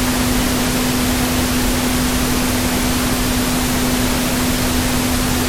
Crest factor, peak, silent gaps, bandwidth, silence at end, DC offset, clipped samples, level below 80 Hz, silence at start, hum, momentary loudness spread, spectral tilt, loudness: 12 dB; -4 dBFS; none; 16 kHz; 0 s; 0.2%; under 0.1%; -26 dBFS; 0 s; none; 0 LU; -3.5 dB/octave; -17 LUFS